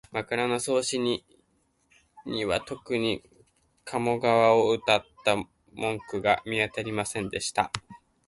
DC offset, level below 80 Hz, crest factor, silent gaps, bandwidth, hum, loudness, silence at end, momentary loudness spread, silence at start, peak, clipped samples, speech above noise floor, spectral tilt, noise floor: under 0.1%; -58 dBFS; 20 dB; none; 11.5 kHz; none; -27 LUFS; 0.3 s; 12 LU; 0.1 s; -8 dBFS; under 0.1%; 43 dB; -4 dB/octave; -70 dBFS